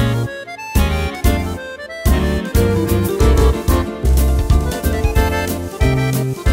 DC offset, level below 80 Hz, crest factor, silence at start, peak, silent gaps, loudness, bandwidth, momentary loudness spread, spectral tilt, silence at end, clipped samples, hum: under 0.1%; -18 dBFS; 14 dB; 0 s; 0 dBFS; none; -17 LUFS; 16.5 kHz; 7 LU; -6 dB/octave; 0 s; under 0.1%; none